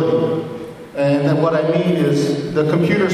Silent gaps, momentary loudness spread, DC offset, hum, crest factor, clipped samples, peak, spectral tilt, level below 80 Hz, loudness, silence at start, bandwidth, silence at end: none; 10 LU; under 0.1%; none; 14 dB; under 0.1%; -2 dBFS; -7 dB/octave; -52 dBFS; -17 LUFS; 0 s; 13 kHz; 0 s